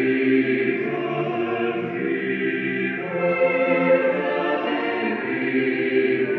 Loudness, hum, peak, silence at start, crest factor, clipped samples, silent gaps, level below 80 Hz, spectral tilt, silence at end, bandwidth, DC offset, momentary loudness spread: -22 LUFS; none; -8 dBFS; 0 s; 14 dB; under 0.1%; none; -72 dBFS; -8.5 dB/octave; 0 s; 5.6 kHz; under 0.1%; 6 LU